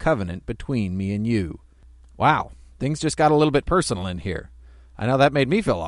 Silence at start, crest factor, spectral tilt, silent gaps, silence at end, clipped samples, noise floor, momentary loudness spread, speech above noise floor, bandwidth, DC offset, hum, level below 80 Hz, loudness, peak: 0 s; 20 dB; -6 dB/octave; none; 0 s; under 0.1%; -49 dBFS; 13 LU; 27 dB; 11.5 kHz; under 0.1%; none; -42 dBFS; -22 LUFS; -2 dBFS